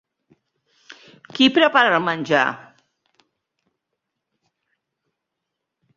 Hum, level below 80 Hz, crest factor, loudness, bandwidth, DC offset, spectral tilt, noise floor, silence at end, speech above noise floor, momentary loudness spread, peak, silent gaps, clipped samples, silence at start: none; -70 dBFS; 22 dB; -17 LUFS; 7.6 kHz; under 0.1%; -4.5 dB/octave; -81 dBFS; 3.4 s; 64 dB; 15 LU; -2 dBFS; none; under 0.1%; 0.9 s